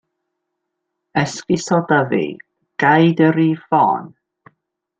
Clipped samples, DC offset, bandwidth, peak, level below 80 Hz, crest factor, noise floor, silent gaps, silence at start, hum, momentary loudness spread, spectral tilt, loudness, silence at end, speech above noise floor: under 0.1%; under 0.1%; 8.8 kHz; -2 dBFS; -60 dBFS; 16 dB; -77 dBFS; none; 1.15 s; none; 11 LU; -6 dB/octave; -17 LUFS; 0.9 s; 61 dB